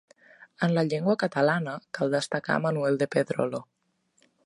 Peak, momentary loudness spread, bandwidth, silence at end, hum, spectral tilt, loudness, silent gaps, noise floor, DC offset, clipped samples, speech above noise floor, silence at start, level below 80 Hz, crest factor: -8 dBFS; 6 LU; 11.5 kHz; 0.85 s; none; -6 dB/octave; -27 LUFS; none; -71 dBFS; under 0.1%; under 0.1%; 45 dB; 0.6 s; -74 dBFS; 20 dB